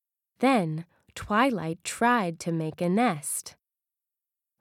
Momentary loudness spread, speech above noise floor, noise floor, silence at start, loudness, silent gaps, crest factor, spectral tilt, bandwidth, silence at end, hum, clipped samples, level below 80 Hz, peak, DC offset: 12 LU; 63 dB; -89 dBFS; 0.4 s; -27 LUFS; none; 18 dB; -5 dB/octave; 17 kHz; 1.1 s; none; under 0.1%; -62 dBFS; -10 dBFS; under 0.1%